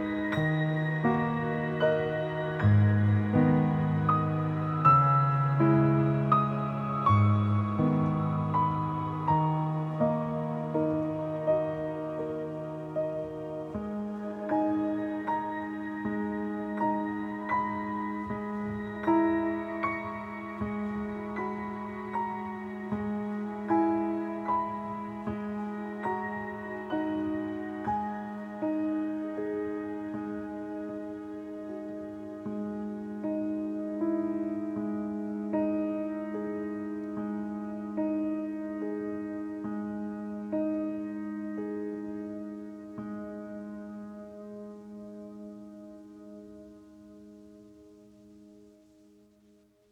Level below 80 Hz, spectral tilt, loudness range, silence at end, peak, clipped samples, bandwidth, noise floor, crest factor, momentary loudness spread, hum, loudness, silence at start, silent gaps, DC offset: -60 dBFS; -9.5 dB/octave; 14 LU; 1.2 s; -10 dBFS; under 0.1%; 6.4 kHz; -63 dBFS; 20 dB; 14 LU; none; -31 LUFS; 0 s; none; under 0.1%